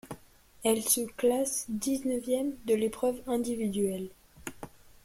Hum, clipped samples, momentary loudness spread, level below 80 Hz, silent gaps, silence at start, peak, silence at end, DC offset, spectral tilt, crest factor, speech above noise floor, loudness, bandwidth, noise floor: none; under 0.1%; 18 LU; -60 dBFS; none; 0.05 s; -12 dBFS; 0.15 s; under 0.1%; -4 dB/octave; 20 dB; 26 dB; -30 LUFS; 16.5 kHz; -55 dBFS